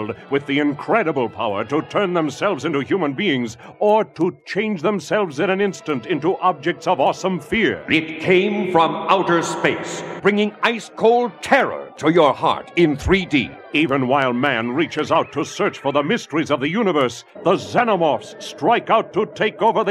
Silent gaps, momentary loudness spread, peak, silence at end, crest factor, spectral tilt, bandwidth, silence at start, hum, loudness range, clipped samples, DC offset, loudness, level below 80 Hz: none; 6 LU; 0 dBFS; 0 s; 18 dB; -5.5 dB/octave; 12.5 kHz; 0 s; none; 3 LU; under 0.1%; under 0.1%; -19 LUFS; -48 dBFS